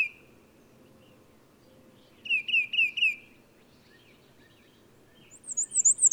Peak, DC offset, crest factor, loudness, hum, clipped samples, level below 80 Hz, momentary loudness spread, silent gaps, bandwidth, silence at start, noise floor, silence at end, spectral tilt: -12 dBFS; under 0.1%; 20 dB; -24 LUFS; none; under 0.1%; -74 dBFS; 19 LU; none; over 20 kHz; 0 s; -59 dBFS; 0 s; 3 dB/octave